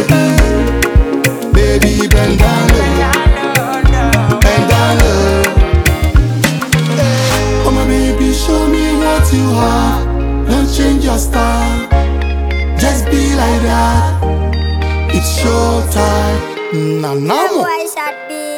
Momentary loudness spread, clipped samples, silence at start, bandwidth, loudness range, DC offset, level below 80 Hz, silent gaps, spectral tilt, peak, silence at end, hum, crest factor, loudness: 5 LU; under 0.1%; 0 s; 19.5 kHz; 3 LU; under 0.1%; -14 dBFS; none; -5.5 dB/octave; 0 dBFS; 0 s; none; 10 dB; -12 LUFS